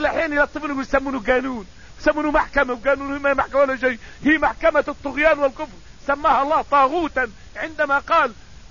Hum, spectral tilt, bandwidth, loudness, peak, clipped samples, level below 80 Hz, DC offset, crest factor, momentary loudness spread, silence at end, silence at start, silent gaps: none; -5 dB/octave; 7.4 kHz; -20 LUFS; -4 dBFS; under 0.1%; -40 dBFS; 0.6%; 16 dB; 9 LU; 0.05 s; 0 s; none